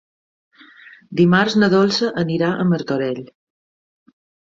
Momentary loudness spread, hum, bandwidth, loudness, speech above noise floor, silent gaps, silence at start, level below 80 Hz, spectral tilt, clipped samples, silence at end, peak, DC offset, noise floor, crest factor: 10 LU; none; 7.6 kHz; -17 LUFS; 28 dB; none; 1.1 s; -58 dBFS; -6.5 dB/octave; under 0.1%; 1.35 s; -2 dBFS; under 0.1%; -45 dBFS; 18 dB